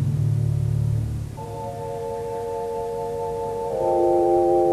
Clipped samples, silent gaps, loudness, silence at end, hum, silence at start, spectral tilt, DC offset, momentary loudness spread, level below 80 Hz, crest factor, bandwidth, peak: under 0.1%; none; -24 LUFS; 0 s; none; 0 s; -9 dB/octave; under 0.1%; 12 LU; -40 dBFS; 14 dB; 13.5 kHz; -8 dBFS